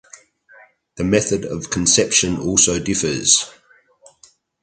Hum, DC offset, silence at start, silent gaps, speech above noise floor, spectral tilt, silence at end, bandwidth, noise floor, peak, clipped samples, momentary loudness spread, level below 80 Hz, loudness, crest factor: none; under 0.1%; 0.95 s; none; 35 dB; -2.5 dB/octave; 1.15 s; 10 kHz; -53 dBFS; 0 dBFS; under 0.1%; 10 LU; -44 dBFS; -16 LUFS; 20 dB